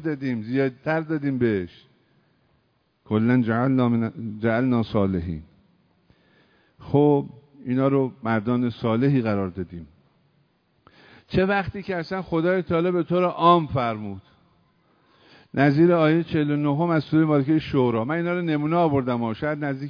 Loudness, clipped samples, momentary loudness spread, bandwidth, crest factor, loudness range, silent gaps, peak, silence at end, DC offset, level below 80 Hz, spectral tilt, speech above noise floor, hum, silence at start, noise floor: -23 LUFS; under 0.1%; 10 LU; 5.4 kHz; 20 dB; 5 LU; none; -4 dBFS; 0 s; under 0.1%; -54 dBFS; -9.5 dB/octave; 45 dB; none; 0 s; -67 dBFS